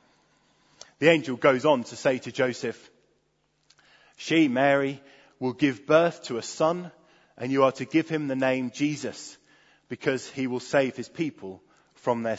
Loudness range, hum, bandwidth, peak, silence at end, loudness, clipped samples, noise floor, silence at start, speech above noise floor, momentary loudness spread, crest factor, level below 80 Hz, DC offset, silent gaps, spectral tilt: 4 LU; none; 8 kHz; -4 dBFS; 0 s; -26 LUFS; under 0.1%; -71 dBFS; 1 s; 46 dB; 15 LU; 22 dB; -72 dBFS; under 0.1%; none; -5.5 dB/octave